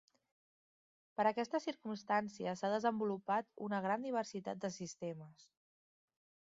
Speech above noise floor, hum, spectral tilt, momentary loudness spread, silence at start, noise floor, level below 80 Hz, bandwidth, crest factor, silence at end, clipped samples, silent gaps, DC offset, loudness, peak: over 51 dB; none; -4.5 dB/octave; 10 LU; 1.2 s; under -90 dBFS; -86 dBFS; 7.6 kHz; 20 dB; 1.05 s; under 0.1%; none; under 0.1%; -39 LUFS; -20 dBFS